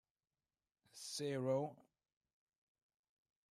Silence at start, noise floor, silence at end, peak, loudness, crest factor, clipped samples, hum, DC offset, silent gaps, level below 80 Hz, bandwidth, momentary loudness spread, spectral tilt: 0.95 s; under -90 dBFS; 1.7 s; -28 dBFS; -43 LUFS; 20 dB; under 0.1%; none; under 0.1%; none; under -90 dBFS; 14.5 kHz; 14 LU; -5 dB/octave